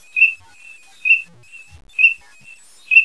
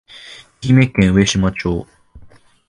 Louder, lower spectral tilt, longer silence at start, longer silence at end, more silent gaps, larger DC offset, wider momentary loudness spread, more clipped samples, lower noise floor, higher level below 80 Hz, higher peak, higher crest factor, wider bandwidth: about the same, -14 LUFS vs -15 LUFS; second, 1 dB/octave vs -5.5 dB/octave; about the same, 0.15 s vs 0.15 s; second, 0 s vs 0.4 s; neither; first, 0.4% vs under 0.1%; second, 18 LU vs 22 LU; neither; about the same, -45 dBFS vs -44 dBFS; second, -60 dBFS vs -34 dBFS; about the same, 0 dBFS vs 0 dBFS; about the same, 18 dB vs 16 dB; about the same, 11 kHz vs 11 kHz